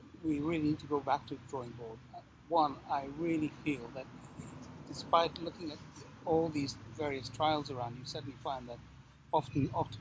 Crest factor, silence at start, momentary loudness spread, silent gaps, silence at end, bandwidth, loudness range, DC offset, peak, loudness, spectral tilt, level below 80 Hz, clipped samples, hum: 24 dB; 0 s; 17 LU; none; 0 s; 8 kHz; 2 LU; under 0.1%; -14 dBFS; -36 LUFS; -6 dB/octave; -60 dBFS; under 0.1%; none